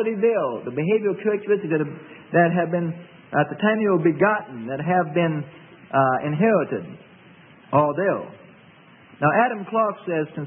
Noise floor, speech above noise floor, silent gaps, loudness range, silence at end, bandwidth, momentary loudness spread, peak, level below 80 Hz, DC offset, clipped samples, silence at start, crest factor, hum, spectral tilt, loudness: -50 dBFS; 28 dB; none; 2 LU; 0 s; 3.6 kHz; 11 LU; -6 dBFS; -68 dBFS; under 0.1%; under 0.1%; 0 s; 18 dB; none; -12 dB/octave; -22 LUFS